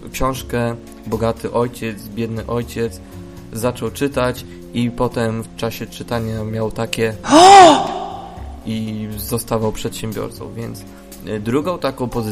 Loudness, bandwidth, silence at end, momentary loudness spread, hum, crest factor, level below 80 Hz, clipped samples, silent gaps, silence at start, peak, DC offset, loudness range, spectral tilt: -17 LUFS; 15.5 kHz; 0 s; 18 LU; none; 18 dB; -38 dBFS; under 0.1%; none; 0 s; 0 dBFS; under 0.1%; 11 LU; -4.5 dB/octave